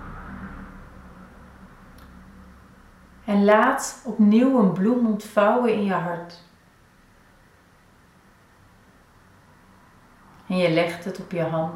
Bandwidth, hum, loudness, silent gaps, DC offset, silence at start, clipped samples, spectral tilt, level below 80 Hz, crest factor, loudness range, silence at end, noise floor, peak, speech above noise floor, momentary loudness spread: 13.5 kHz; none; -21 LUFS; none; under 0.1%; 0 s; under 0.1%; -6.5 dB/octave; -52 dBFS; 20 dB; 15 LU; 0 s; -55 dBFS; -4 dBFS; 35 dB; 21 LU